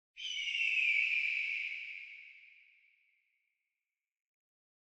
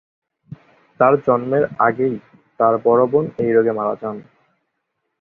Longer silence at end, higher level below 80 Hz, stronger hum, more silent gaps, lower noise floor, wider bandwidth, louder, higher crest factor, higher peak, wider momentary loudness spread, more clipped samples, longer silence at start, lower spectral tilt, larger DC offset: first, 2.45 s vs 1 s; second, -86 dBFS vs -60 dBFS; neither; neither; first, under -90 dBFS vs -74 dBFS; first, 9.2 kHz vs 3.8 kHz; second, -32 LUFS vs -17 LUFS; about the same, 20 dB vs 18 dB; second, -20 dBFS vs -2 dBFS; first, 18 LU vs 11 LU; neither; second, 0.15 s vs 0.5 s; second, 5.5 dB/octave vs -11 dB/octave; neither